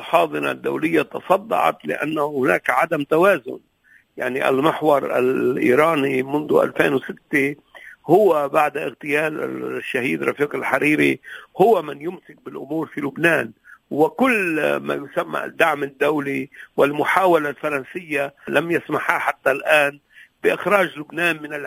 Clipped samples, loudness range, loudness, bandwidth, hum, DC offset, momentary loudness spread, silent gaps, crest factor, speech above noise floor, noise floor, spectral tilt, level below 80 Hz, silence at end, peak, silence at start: under 0.1%; 2 LU; -20 LUFS; 16 kHz; none; under 0.1%; 11 LU; none; 20 dB; 31 dB; -51 dBFS; -5.5 dB/octave; -64 dBFS; 0 s; 0 dBFS; 0 s